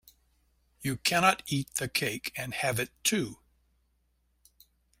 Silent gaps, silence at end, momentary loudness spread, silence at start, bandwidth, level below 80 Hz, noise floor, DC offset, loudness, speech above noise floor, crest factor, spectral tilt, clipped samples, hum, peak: none; 1.65 s; 11 LU; 0.8 s; 16.5 kHz; -62 dBFS; -73 dBFS; under 0.1%; -29 LUFS; 43 dB; 26 dB; -3 dB/octave; under 0.1%; none; -6 dBFS